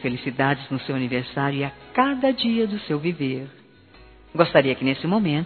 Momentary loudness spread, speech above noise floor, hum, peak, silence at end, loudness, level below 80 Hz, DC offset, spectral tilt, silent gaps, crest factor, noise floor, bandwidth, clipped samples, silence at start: 9 LU; 27 dB; none; 0 dBFS; 0 s; -23 LUFS; -56 dBFS; under 0.1%; -4.5 dB/octave; none; 22 dB; -50 dBFS; 4.6 kHz; under 0.1%; 0 s